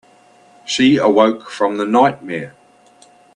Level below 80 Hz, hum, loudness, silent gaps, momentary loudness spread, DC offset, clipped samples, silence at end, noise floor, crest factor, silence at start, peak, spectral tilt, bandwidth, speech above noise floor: -62 dBFS; none; -15 LUFS; none; 15 LU; under 0.1%; under 0.1%; 0.85 s; -49 dBFS; 16 dB; 0.65 s; 0 dBFS; -5 dB/octave; 10.5 kHz; 34 dB